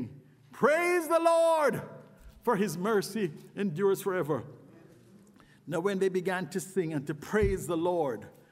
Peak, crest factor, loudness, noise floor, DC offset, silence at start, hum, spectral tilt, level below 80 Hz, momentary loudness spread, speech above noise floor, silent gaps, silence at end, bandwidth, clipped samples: -12 dBFS; 18 dB; -29 LUFS; -58 dBFS; under 0.1%; 0 s; none; -5.5 dB/octave; -52 dBFS; 11 LU; 29 dB; none; 0.2 s; 16 kHz; under 0.1%